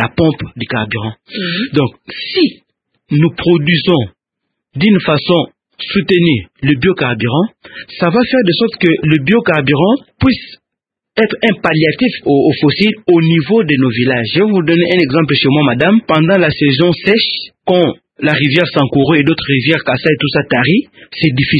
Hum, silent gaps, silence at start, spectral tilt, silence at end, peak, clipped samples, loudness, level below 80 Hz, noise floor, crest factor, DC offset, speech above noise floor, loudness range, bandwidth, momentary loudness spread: none; none; 0 s; -8.5 dB/octave; 0 s; 0 dBFS; under 0.1%; -12 LUFS; -44 dBFS; -80 dBFS; 12 dB; under 0.1%; 68 dB; 3 LU; 5 kHz; 8 LU